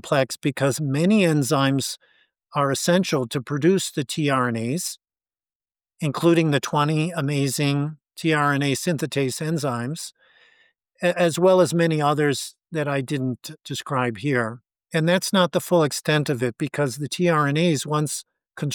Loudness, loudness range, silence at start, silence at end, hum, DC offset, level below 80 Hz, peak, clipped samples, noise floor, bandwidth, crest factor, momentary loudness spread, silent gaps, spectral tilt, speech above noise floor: -22 LUFS; 3 LU; 0.05 s; 0 s; none; under 0.1%; -70 dBFS; -8 dBFS; under 0.1%; under -90 dBFS; 19 kHz; 16 dB; 10 LU; 5.55-5.60 s; -5 dB/octave; over 68 dB